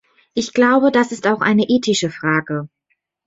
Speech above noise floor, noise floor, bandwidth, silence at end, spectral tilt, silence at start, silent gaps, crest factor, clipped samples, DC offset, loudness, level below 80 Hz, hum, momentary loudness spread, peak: 53 dB; -70 dBFS; 8 kHz; 0.6 s; -4.5 dB/octave; 0.35 s; none; 14 dB; under 0.1%; under 0.1%; -17 LUFS; -60 dBFS; none; 13 LU; -2 dBFS